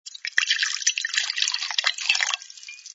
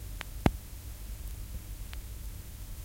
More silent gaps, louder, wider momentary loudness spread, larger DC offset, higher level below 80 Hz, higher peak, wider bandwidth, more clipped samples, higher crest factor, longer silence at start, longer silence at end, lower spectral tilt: neither; first, -22 LUFS vs -39 LUFS; second, 7 LU vs 13 LU; neither; second, -80 dBFS vs -42 dBFS; about the same, -2 dBFS vs -4 dBFS; second, 8.2 kHz vs 16.5 kHz; neither; second, 24 dB vs 32 dB; about the same, 0.05 s vs 0 s; about the same, 0 s vs 0 s; second, 5.5 dB/octave vs -5.5 dB/octave